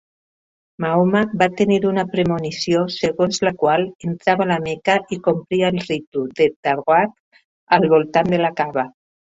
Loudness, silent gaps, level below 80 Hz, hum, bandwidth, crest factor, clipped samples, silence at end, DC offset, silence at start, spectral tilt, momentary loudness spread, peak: -19 LUFS; 3.95-3.99 s, 6.07-6.12 s, 6.56-6.63 s, 7.20-7.31 s, 7.45-7.67 s; -56 dBFS; none; 8 kHz; 18 dB; under 0.1%; 0.4 s; under 0.1%; 0.8 s; -6 dB/octave; 7 LU; -2 dBFS